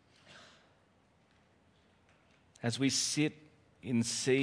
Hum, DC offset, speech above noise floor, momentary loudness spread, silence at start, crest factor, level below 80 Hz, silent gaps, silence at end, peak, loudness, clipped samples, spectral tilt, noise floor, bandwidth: none; under 0.1%; 37 dB; 26 LU; 0.3 s; 20 dB; -76 dBFS; none; 0 s; -16 dBFS; -33 LUFS; under 0.1%; -3.5 dB/octave; -69 dBFS; 10.5 kHz